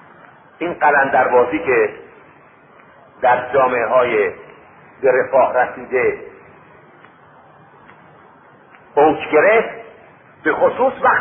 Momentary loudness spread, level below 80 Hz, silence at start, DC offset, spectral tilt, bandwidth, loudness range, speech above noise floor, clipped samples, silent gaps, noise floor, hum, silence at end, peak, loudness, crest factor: 10 LU; -56 dBFS; 0.6 s; under 0.1%; -10 dB/octave; 3.6 kHz; 6 LU; 31 dB; under 0.1%; none; -46 dBFS; none; 0 s; -2 dBFS; -16 LUFS; 16 dB